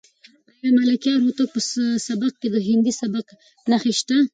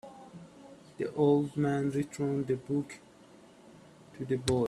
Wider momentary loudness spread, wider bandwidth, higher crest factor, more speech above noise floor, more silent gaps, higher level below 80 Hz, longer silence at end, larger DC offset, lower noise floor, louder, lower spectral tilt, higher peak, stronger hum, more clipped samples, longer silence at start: second, 8 LU vs 24 LU; second, 9.4 kHz vs 12.5 kHz; second, 14 dB vs 20 dB; first, 34 dB vs 26 dB; neither; about the same, -68 dBFS vs -64 dBFS; about the same, 0.05 s vs 0 s; neither; about the same, -54 dBFS vs -56 dBFS; first, -21 LUFS vs -31 LUFS; second, -4 dB/octave vs -7 dB/octave; first, -8 dBFS vs -12 dBFS; neither; neither; first, 0.65 s vs 0.05 s